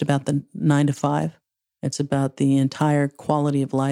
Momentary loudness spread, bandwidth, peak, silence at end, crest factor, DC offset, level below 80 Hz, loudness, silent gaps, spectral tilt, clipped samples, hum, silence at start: 7 LU; 11.5 kHz; -4 dBFS; 0 s; 16 dB; under 0.1%; -62 dBFS; -22 LUFS; none; -7 dB/octave; under 0.1%; none; 0 s